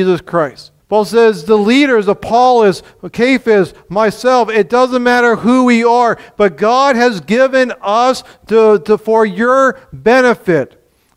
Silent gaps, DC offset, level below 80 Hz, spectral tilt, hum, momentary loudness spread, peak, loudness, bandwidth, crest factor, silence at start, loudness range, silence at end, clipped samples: none; under 0.1%; -48 dBFS; -5.5 dB/octave; none; 6 LU; 0 dBFS; -11 LUFS; 14 kHz; 12 dB; 0 s; 1 LU; 0.5 s; under 0.1%